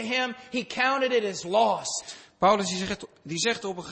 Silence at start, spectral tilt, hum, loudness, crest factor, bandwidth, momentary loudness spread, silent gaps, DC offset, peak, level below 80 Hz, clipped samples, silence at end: 0 s; -3 dB/octave; none; -26 LUFS; 18 dB; 8.8 kHz; 10 LU; none; under 0.1%; -10 dBFS; -62 dBFS; under 0.1%; 0 s